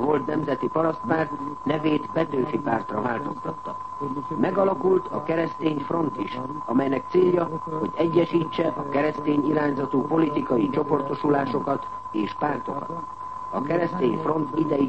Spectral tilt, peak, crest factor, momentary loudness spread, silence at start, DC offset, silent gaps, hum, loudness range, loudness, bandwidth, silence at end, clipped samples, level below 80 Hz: -8.5 dB/octave; -8 dBFS; 16 dB; 9 LU; 0 s; 0.4%; none; none; 3 LU; -25 LUFS; 8.4 kHz; 0 s; under 0.1%; -58 dBFS